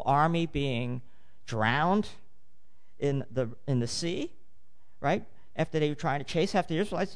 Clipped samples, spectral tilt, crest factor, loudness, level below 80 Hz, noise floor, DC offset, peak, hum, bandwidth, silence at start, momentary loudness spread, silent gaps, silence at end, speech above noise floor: under 0.1%; -6 dB/octave; 18 dB; -30 LUFS; -54 dBFS; -70 dBFS; 1%; -12 dBFS; none; 10.5 kHz; 0 s; 11 LU; none; 0 s; 41 dB